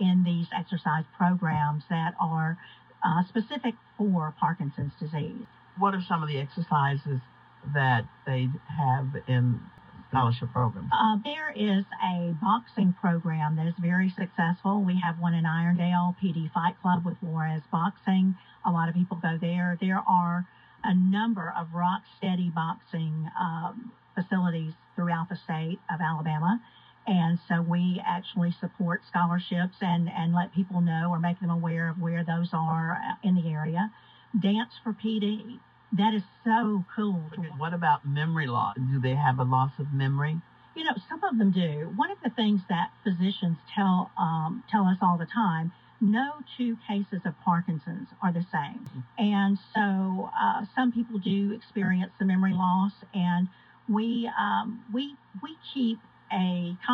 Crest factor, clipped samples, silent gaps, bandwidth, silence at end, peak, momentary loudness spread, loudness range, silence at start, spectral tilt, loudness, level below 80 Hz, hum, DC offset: 16 dB; under 0.1%; none; 5 kHz; 0 s; -10 dBFS; 8 LU; 3 LU; 0 s; -9.5 dB/octave; -28 LUFS; -70 dBFS; none; under 0.1%